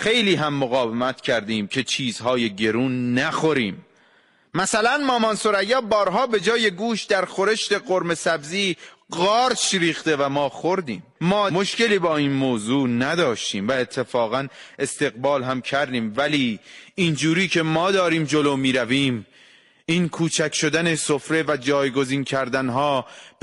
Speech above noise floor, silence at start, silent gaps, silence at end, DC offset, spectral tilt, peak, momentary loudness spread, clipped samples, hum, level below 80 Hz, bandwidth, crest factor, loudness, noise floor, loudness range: 37 dB; 0 s; none; 0.15 s; under 0.1%; -4 dB/octave; -8 dBFS; 6 LU; under 0.1%; none; -60 dBFS; 11.5 kHz; 14 dB; -21 LUFS; -58 dBFS; 2 LU